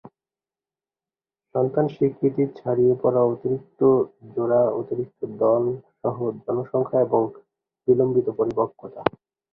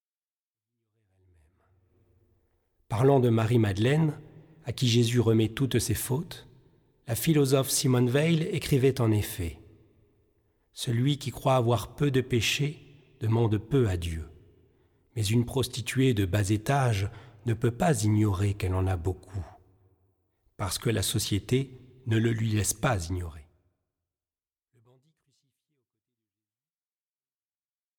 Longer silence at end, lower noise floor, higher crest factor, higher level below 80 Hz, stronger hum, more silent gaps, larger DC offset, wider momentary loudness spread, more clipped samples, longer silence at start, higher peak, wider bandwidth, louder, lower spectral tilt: second, 0.45 s vs 4.55 s; about the same, under -90 dBFS vs under -90 dBFS; about the same, 22 dB vs 18 dB; second, -62 dBFS vs -52 dBFS; neither; neither; neither; second, 9 LU vs 14 LU; neither; second, 1.55 s vs 2.9 s; first, 0 dBFS vs -12 dBFS; second, 4.3 kHz vs 19 kHz; first, -23 LUFS vs -27 LUFS; first, -11 dB/octave vs -5.5 dB/octave